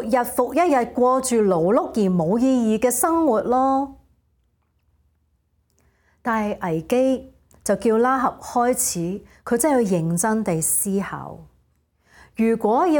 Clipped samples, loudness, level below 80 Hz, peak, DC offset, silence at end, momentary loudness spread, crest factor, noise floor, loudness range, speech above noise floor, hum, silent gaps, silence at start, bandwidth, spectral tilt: under 0.1%; -20 LUFS; -54 dBFS; -6 dBFS; under 0.1%; 0 s; 9 LU; 16 dB; -66 dBFS; 7 LU; 46 dB; none; none; 0 s; 17.5 kHz; -5 dB/octave